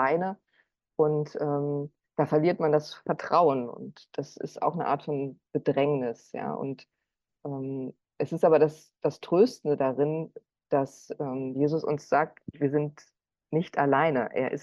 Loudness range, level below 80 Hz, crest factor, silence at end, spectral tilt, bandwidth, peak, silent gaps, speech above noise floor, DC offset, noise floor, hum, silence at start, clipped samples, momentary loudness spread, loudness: 4 LU; -74 dBFS; 18 dB; 0 s; -7.5 dB/octave; 11 kHz; -10 dBFS; none; 44 dB; under 0.1%; -71 dBFS; none; 0 s; under 0.1%; 14 LU; -28 LUFS